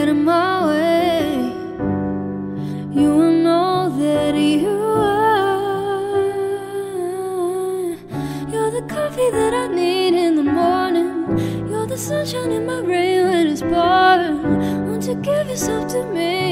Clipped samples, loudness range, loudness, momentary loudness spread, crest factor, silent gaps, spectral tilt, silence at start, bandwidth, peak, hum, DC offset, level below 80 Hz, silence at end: under 0.1%; 5 LU; -18 LUFS; 9 LU; 14 dB; none; -5.5 dB/octave; 0 s; 16 kHz; -4 dBFS; none; under 0.1%; -48 dBFS; 0 s